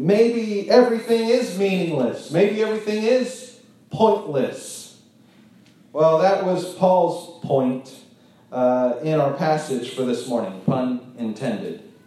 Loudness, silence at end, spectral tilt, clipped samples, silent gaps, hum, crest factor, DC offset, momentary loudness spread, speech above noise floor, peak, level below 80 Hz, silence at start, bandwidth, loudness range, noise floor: -21 LUFS; 0.2 s; -6 dB/octave; under 0.1%; none; none; 20 dB; under 0.1%; 13 LU; 32 dB; -2 dBFS; -72 dBFS; 0 s; 13 kHz; 4 LU; -52 dBFS